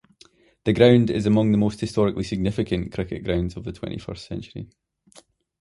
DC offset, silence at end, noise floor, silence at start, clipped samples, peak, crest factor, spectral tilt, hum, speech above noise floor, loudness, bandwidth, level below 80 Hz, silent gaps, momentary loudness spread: under 0.1%; 0.95 s; -56 dBFS; 0.65 s; under 0.1%; -2 dBFS; 20 dB; -7.5 dB/octave; none; 34 dB; -22 LUFS; 11.5 kHz; -44 dBFS; none; 18 LU